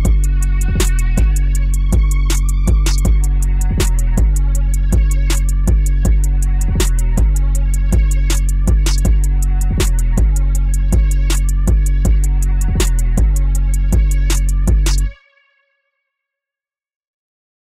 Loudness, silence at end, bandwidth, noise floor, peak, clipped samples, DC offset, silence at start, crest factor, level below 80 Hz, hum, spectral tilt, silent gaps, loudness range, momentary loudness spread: -16 LUFS; 2.6 s; 15 kHz; -90 dBFS; -4 dBFS; under 0.1%; under 0.1%; 0 s; 8 dB; -14 dBFS; none; -5 dB/octave; none; 2 LU; 2 LU